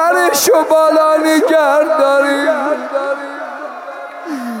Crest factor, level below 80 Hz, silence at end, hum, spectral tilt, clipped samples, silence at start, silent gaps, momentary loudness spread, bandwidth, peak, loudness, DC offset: 10 dB; -68 dBFS; 0 s; none; -1.5 dB/octave; under 0.1%; 0 s; none; 16 LU; 17 kHz; -2 dBFS; -12 LUFS; under 0.1%